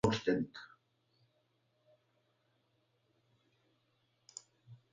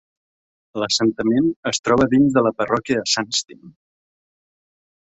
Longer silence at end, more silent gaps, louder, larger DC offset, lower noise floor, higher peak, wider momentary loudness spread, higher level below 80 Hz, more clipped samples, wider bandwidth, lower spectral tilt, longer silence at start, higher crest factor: second, 0.15 s vs 1.3 s; second, none vs 1.56-1.63 s, 1.79-1.83 s; second, -36 LUFS vs -19 LUFS; neither; second, -78 dBFS vs under -90 dBFS; second, -16 dBFS vs -4 dBFS; first, 20 LU vs 8 LU; second, -66 dBFS vs -52 dBFS; neither; about the same, 9 kHz vs 8.2 kHz; first, -5.5 dB/octave vs -4 dB/octave; second, 0.05 s vs 0.75 s; first, 28 dB vs 18 dB